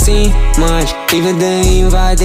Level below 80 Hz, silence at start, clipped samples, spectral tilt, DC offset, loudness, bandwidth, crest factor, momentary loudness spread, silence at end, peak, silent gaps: -12 dBFS; 0 s; under 0.1%; -4.5 dB/octave; under 0.1%; -12 LUFS; 16 kHz; 8 dB; 2 LU; 0 s; -2 dBFS; none